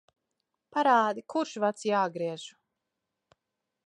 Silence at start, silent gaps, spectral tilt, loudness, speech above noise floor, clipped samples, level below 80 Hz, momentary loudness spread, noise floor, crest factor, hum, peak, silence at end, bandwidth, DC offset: 0.75 s; none; -4.5 dB/octave; -28 LUFS; 58 dB; under 0.1%; -86 dBFS; 12 LU; -85 dBFS; 20 dB; none; -10 dBFS; 1.4 s; 11 kHz; under 0.1%